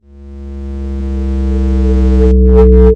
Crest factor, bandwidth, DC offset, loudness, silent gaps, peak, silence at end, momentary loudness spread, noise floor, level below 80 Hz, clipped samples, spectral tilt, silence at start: 10 dB; 3.7 kHz; under 0.1%; -11 LUFS; none; 0 dBFS; 0 s; 18 LU; -29 dBFS; -10 dBFS; 1%; -10.5 dB/octave; 0.2 s